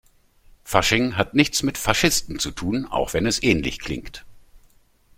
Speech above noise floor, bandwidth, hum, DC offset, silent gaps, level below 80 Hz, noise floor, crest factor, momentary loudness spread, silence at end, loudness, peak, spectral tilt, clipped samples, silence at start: 34 dB; 16.5 kHz; none; under 0.1%; none; -40 dBFS; -56 dBFS; 22 dB; 12 LU; 0.6 s; -21 LUFS; -2 dBFS; -3.5 dB/octave; under 0.1%; 0.65 s